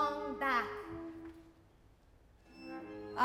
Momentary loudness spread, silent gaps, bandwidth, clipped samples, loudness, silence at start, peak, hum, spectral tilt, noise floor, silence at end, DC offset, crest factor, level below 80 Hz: 20 LU; none; 16 kHz; under 0.1%; -39 LUFS; 0 s; -20 dBFS; none; -5 dB/octave; -64 dBFS; 0 s; under 0.1%; 20 dB; -64 dBFS